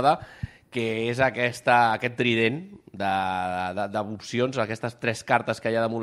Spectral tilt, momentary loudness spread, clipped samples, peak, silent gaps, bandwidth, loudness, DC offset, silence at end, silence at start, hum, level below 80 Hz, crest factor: -5.5 dB/octave; 10 LU; under 0.1%; -6 dBFS; none; 13.5 kHz; -25 LUFS; under 0.1%; 0 s; 0 s; none; -58 dBFS; 20 dB